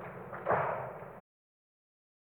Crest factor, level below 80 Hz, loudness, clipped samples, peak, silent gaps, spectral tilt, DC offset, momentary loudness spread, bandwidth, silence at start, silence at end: 22 dB; -70 dBFS; -35 LUFS; under 0.1%; -18 dBFS; none; -8.5 dB/octave; under 0.1%; 18 LU; 19 kHz; 0 s; 1.2 s